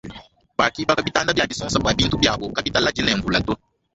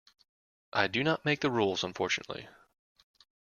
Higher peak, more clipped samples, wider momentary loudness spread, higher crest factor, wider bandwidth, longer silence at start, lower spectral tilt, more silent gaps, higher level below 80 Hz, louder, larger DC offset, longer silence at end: first, -2 dBFS vs -12 dBFS; neither; about the same, 8 LU vs 8 LU; about the same, 20 dB vs 22 dB; second, 8.4 kHz vs 11.5 kHz; second, 0.05 s vs 0.75 s; about the same, -4 dB/octave vs -4.5 dB/octave; neither; first, -40 dBFS vs -70 dBFS; first, -20 LUFS vs -30 LUFS; neither; second, 0.4 s vs 0.95 s